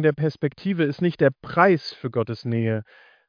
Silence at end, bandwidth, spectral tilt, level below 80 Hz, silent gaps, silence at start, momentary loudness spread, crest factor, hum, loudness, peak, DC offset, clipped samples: 0.45 s; 5.2 kHz; -8.5 dB/octave; -62 dBFS; none; 0 s; 9 LU; 20 dB; none; -23 LUFS; -2 dBFS; under 0.1%; under 0.1%